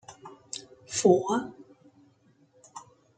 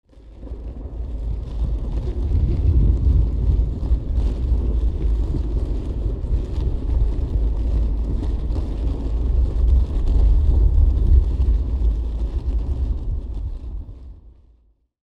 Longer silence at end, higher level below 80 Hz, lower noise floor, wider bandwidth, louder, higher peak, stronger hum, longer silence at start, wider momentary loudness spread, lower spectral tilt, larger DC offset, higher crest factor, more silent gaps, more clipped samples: second, 0.35 s vs 0.75 s; second, -72 dBFS vs -20 dBFS; first, -63 dBFS vs -58 dBFS; first, 9.4 kHz vs 4.3 kHz; second, -27 LUFS vs -23 LUFS; second, -8 dBFS vs -4 dBFS; neither; about the same, 0.1 s vs 0.15 s; first, 25 LU vs 13 LU; second, -4.5 dB/octave vs -10 dB/octave; neither; first, 24 dB vs 16 dB; neither; neither